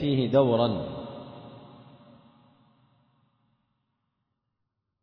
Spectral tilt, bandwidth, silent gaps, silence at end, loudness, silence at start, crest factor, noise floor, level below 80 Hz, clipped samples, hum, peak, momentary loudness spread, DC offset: -10 dB/octave; 5.4 kHz; none; 3.2 s; -25 LUFS; 0 s; 22 dB; -81 dBFS; -62 dBFS; under 0.1%; none; -10 dBFS; 25 LU; under 0.1%